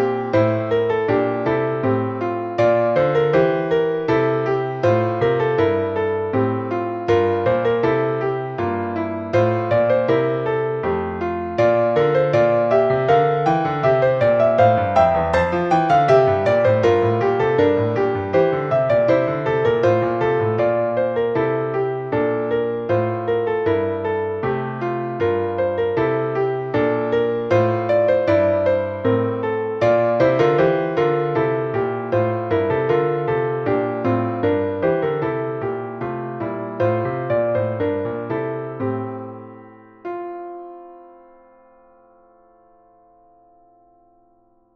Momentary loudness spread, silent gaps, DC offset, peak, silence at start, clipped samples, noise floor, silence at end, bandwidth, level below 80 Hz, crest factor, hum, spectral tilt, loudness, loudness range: 8 LU; none; under 0.1%; -2 dBFS; 0 s; under 0.1%; -58 dBFS; 3.7 s; 7.2 kHz; -50 dBFS; 16 dB; none; -8.5 dB/octave; -19 LUFS; 7 LU